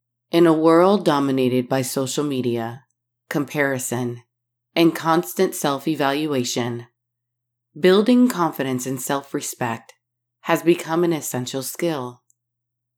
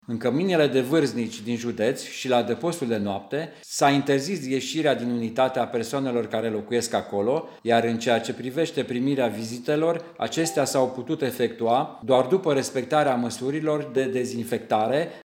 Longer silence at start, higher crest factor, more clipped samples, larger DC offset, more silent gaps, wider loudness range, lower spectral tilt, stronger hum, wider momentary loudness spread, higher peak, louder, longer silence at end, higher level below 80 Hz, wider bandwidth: first, 0.35 s vs 0.1 s; about the same, 18 dB vs 18 dB; neither; neither; neither; first, 4 LU vs 1 LU; about the same, -5 dB/octave vs -5 dB/octave; neither; first, 12 LU vs 7 LU; about the same, -4 dBFS vs -6 dBFS; first, -20 LUFS vs -25 LUFS; first, 0.85 s vs 0 s; second, -86 dBFS vs -74 dBFS; first, 19 kHz vs 17 kHz